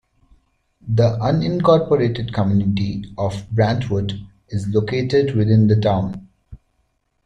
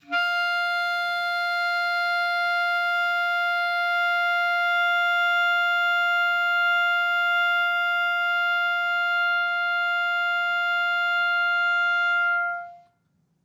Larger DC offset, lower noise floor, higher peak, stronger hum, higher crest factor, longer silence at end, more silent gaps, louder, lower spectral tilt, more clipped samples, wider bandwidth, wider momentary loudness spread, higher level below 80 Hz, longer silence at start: neither; about the same, -67 dBFS vs -69 dBFS; first, -2 dBFS vs -14 dBFS; neither; first, 16 dB vs 8 dB; about the same, 0.7 s vs 0.65 s; neither; first, -19 LUFS vs -22 LUFS; first, -8.5 dB/octave vs 0 dB/octave; neither; second, 8.2 kHz vs 17 kHz; first, 12 LU vs 3 LU; first, -46 dBFS vs -86 dBFS; first, 0.85 s vs 0.1 s